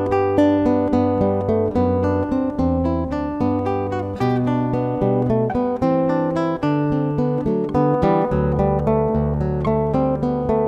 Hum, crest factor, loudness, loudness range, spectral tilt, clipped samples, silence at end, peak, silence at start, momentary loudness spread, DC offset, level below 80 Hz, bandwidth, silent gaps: none; 14 dB; -20 LUFS; 2 LU; -9.5 dB/octave; under 0.1%; 0 s; -4 dBFS; 0 s; 4 LU; under 0.1%; -36 dBFS; 8 kHz; none